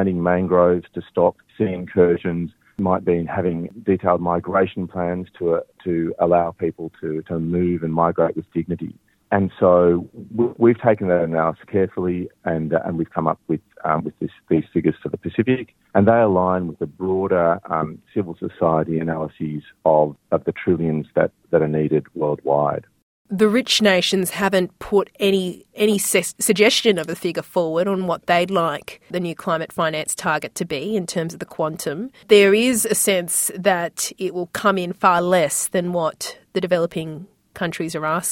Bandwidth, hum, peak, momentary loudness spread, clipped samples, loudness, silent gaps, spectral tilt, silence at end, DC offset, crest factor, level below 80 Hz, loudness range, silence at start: 17 kHz; none; -2 dBFS; 11 LU; under 0.1%; -20 LUFS; 23.02-23.25 s; -4.5 dB/octave; 0 s; under 0.1%; 18 dB; -58 dBFS; 4 LU; 0 s